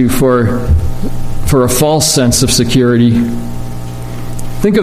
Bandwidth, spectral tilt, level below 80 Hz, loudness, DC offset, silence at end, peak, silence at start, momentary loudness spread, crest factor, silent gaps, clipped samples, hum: 15.5 kHz; -5 dB/octave; -20 dBFS; -11 LUFS; under 0.1%; 0 s; 0 dBFS; 0 s; 15 LU; 10 dB; none; under 0.1%; 60 Hz at -25 dBFS